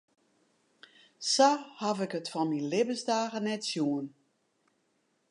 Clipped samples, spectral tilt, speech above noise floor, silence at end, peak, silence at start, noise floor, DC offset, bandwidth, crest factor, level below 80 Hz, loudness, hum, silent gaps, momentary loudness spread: under 0.1%; -3.5 dB/octave; 45 dB; 1.2 s; -10 dBFS; 1.2 s; -75 dBFS; under 0.1%; 11.5 kHz; 22 dB; -88 dBFS; -30 LUFS; none; none; 10 LU